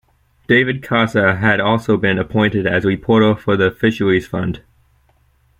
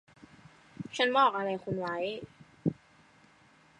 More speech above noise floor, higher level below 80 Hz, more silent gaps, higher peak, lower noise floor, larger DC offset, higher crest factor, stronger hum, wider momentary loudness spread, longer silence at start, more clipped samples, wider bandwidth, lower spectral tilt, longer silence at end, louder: first, 41 dB vs 32 dB; first, -46 dBFS vs -68 dBFS; neither; first, -2 dBFS vs -12 dBFS; second, -56 dBFS vs -62 dBFS; neither; second, 16 dB vs 22 dB; neither; second, 4 LU vs 21 LU; second, 0.5 s vs 0.8 s; neither; first, 15.5 kHz vs 11 kHz; first, -7 dB/octave vs -5.5 dB/octave; about the same, 1 s vs 1.05 s; first, -16 LUFS vs -31 LUFS